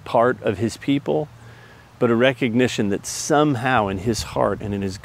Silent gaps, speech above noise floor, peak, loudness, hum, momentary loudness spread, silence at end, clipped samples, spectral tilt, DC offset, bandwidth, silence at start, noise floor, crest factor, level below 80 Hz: none; 25 dB; 0 dBFS; -21 LUFS; none; 7 LU; 0.05 s; under 0.1%; -5 dB/octave; under 0.1%; 16 kHz; 0.05 s; -45 dBFS; 20 dB; -46 dBFS